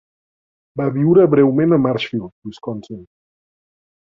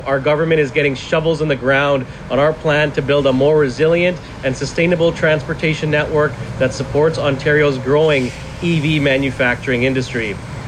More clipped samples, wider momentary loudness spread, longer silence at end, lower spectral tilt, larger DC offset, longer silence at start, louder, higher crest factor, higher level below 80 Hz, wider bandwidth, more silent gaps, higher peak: neither; first, 20 LU vs 6 LU; first, 1.15 s vs 0 s; first, -9 dB/octave vs -6 dB/octave; neither; first, 0.75 s vs 0 s; about the same, -15 LUFS vs -16 LUFS; about the same, 16 dB vs 12 dB; second, -58 dBFS vs -38 dBFS; second, 7.2 kHz vs 10.5 kHz; first, 2.32-2.42 s vs none; about the same, -2 dBFS vs -4 dBFS